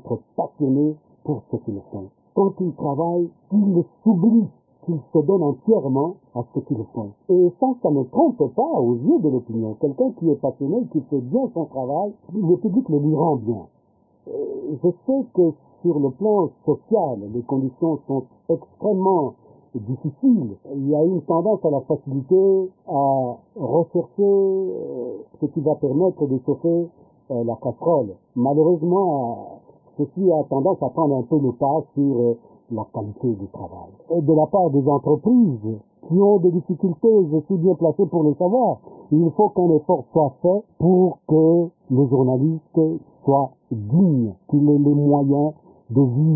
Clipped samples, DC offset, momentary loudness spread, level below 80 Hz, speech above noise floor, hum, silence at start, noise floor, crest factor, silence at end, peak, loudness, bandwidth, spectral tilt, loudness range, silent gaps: under 0.1%; under 0.1%; 12 LU; -60 dBFS; 40 dB; none; 0.05 s; -60 dBFS; 16 dB; 0 s; -4 dBFS; -20 LUFS; 1.1 kHz; -19 dB/octave; 4 LU; none